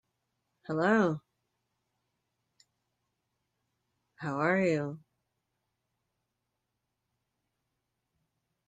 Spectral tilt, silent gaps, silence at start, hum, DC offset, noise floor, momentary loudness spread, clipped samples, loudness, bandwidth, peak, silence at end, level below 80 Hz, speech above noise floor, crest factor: -7.5 dB/octave; none; 0.7 s; none; under 0.1%; -84 dBFS; 16 LU; under 0.1%; -30 LUFS; 9.2 kHz; -14 dBFS; 3.7 s; -78 dBFS; 56 dB; 22 dB